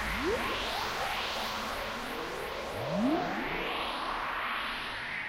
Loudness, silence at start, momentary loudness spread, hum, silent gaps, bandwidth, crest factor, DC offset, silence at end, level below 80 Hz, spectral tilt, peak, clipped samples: -33 LUFS; 0 s; 6 LU; none; none; 16 kHz; 14 dB; under 0.1%; 0 s; -50 dBFS; -4 dB/octave; -18 dBFS; under 0.1%